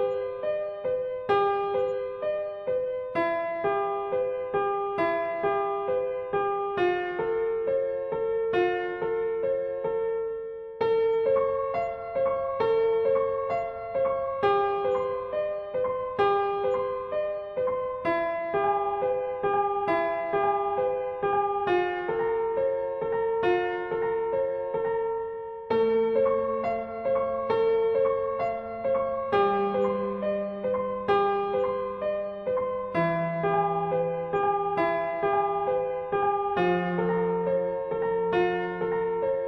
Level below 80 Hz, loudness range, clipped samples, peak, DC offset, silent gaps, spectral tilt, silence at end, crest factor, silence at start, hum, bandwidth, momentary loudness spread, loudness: -60 dBFS; 2 LU; under 0.1%; -12 dBFS; under 0.1%; none; -8 dB/octave; 0 s; 14 dB; 0 s; none; 6 kHz; 6 LU; -27 LUFS